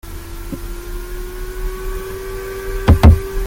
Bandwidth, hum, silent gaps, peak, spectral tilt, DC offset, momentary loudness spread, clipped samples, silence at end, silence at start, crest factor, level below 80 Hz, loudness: 17 kHz; none; none; 0 dBFS; -7 dB/octave; under 0.1%; 19 LU; under 0.1%; 0 s; 0.05 s; 16 dB; -22 dBFS; -17 LUFS